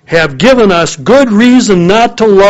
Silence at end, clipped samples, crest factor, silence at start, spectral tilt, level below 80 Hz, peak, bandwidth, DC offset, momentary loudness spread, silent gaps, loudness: 0 s; 3%; 6 dB; 0.1 s; -5 dB/octave; -32 dBFS; 0 dBFS; 9 kHz; under 0.1%; 3 LU; none; -7 LUFS